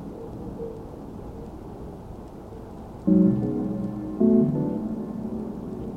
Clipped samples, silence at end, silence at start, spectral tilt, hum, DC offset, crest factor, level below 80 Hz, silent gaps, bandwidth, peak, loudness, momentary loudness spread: under 0.1%; 0 s; 0 s; -11 dB/octave; none; under 0.1%; 18 dB; -46 dBFS; none; 5.2 kHz; -8 dBFS; -25 LUFS; 20 LU